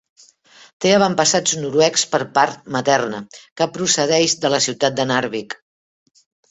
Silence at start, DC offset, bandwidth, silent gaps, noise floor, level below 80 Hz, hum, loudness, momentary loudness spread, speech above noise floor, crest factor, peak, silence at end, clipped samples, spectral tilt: 0.8 s; under 0.1%; 8.4 kHz; 3.52-3.56 s; -49 dBFS; -60 dBFS; none; -17 LUFS; 11 LU; 31 dB; 18 dB; 0 dBFS; 0.95 s; under 0.1%; -2.5 dB/octave